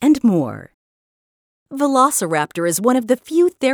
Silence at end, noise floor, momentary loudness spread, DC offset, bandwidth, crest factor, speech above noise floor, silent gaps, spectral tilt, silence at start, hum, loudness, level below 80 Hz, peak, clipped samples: 0 s; under -90 dBFS; 10 LU; under 0.1%; over 20 kHz; 16 dB; over 73 dB; 0.74-1.66 s; -4.5 dB/octave; 0 s; none; -17 LUFS; -60 dBFS; -2 dBFS; under 0.1%